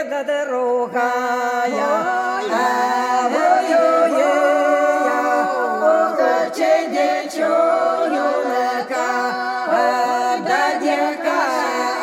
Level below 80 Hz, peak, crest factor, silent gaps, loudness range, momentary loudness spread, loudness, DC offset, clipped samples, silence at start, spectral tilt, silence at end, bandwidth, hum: -76 dBFS; -4 dBFS; 14 dB; none; 3 LU; 5 LU; -18 LUFS; under 0.1%; under 0.1%; 0 s; -3 dB/octave; 0 s; 16.5 kHz; none